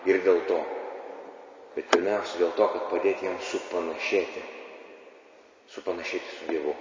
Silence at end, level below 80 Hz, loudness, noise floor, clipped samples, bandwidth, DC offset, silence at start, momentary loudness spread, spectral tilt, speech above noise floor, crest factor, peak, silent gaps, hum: 0 s; -70 dBFS; -28 LUFS; -55 dBFS; under 0.1%; 7.6 kHz; under 0.1%; 0 s; 19 LU; -3.5 dB/octave; 27 dB; 26 dB; -4 dBFS; none; none